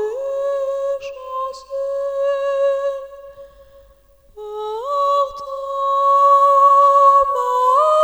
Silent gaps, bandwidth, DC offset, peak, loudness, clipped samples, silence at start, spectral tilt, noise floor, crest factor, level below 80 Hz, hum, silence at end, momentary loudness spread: none; 14.5 kHz; under 0.1%; -4 dBFS; -16 LUFS; under 0.1%; 0 s; -1.5 dB/octave; -51 dBFS; 14 dB; -54 dBFS; 50 Hz at -60 dBFS; 0 s; 17 LU